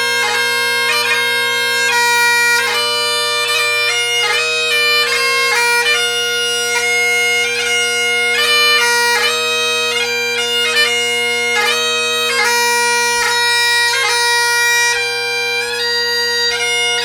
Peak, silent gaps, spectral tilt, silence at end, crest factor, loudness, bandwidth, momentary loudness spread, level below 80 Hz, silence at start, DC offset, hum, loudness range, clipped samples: 0 dBFS; none; 1 dB/octave; 0 s; 14 dB; -12 LUFS; over 20 kHz; 4 LU; -60 dBFS; 0 s; under 0.1%; none; 1 LU; under 0.1%